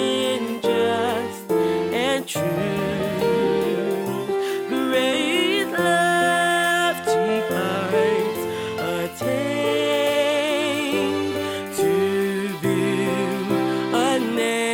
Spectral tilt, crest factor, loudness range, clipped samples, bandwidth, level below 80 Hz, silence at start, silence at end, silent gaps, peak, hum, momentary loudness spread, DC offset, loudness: -4.5 dB/octave; 14 dB; 3 LU; under 0.1%; 17 kHz; -58 dBFS; 0 s; 0 s; none; -8 dBFS; none; 6 LU; under 0.1%; -22 LUFS